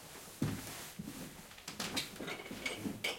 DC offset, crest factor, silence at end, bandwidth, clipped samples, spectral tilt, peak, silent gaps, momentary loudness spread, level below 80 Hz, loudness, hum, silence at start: under 0.1%; 22 dB; 0 s; 17 kHz; under 0.1%; -3.5 dB/octave; -22 dBFS; none; 10 LU; -64 dBFS; -42 LUFS; none; 0 s